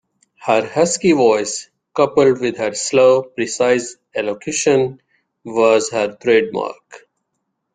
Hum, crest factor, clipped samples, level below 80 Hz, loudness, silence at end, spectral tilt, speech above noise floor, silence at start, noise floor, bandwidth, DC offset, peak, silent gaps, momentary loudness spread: none; 16 dB; under 0.1%; -60 dBFS; -17 LUFS; 0.75 s; -4 dB/octave; 57 dB; 0.4 s; -73 dBFS; 9.6 kHz; under 0.1%; 0 dBFS; none; 11 LU